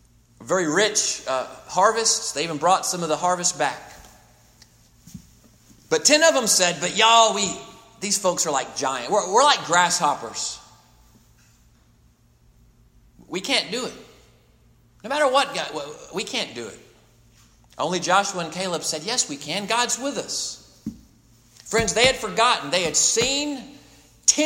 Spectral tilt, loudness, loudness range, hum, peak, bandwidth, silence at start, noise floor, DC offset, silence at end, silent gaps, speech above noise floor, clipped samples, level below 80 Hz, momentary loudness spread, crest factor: -1.5 dB/octave; -21 LUFS; 11 LU; none; -2 dBFS; 16.5 kHz; 0.4 s; -57 dBFS; under 0.1%; 0 s; none; 36 dB; under 0.1%; -56 dBFS; 14 LU; 22 dB